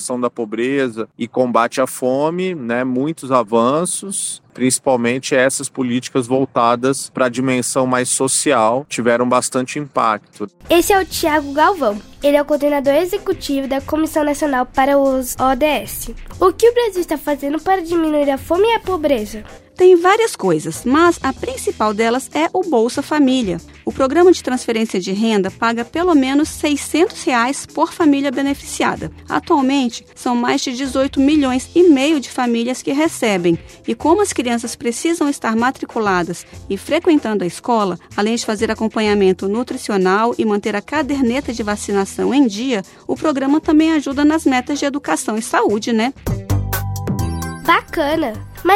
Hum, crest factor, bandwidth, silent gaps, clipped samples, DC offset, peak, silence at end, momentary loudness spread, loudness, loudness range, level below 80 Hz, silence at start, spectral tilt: none; 16 dB; 16.5 kHz; none; under 0.1%; under 0.1%; 0 dBFS; 0 s; 8 LU; -17 LUFS; 3 LU; -42 dBFS; 0 s; -4.5 dB/octave